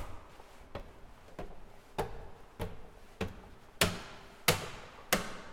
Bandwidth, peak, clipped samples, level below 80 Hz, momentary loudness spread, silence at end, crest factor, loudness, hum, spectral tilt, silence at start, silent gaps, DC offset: 17.5 kHz; -10 dBFS; under 0.1%; -52 dBFS; 24 LU; 0 s; 30 dB; -35 LUFS; none; -3 dB/octave; 0 s; none; under 0.1%